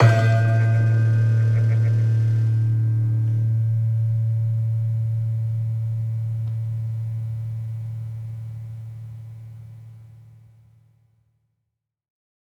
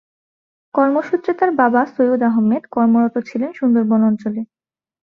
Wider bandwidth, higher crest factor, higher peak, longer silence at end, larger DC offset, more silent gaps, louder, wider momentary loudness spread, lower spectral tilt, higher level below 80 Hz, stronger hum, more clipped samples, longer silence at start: first, 6.4 kHz vs 5.2 kHz; about the same, 18 dB vs 16 dB; about the same, -4 dBFS vs -2 dBFS; first, 2.2 s vs 0.6 s; neither; neither; second, -22 LUFS vs -17 LUFS; first, 17 LU vs 9 LU; about the same, -8.5 dB/octave vs -9 dB/octave; first, -56 dBFS vs -64 dBFS; neither; neither; second, 0 s vs 0.75 s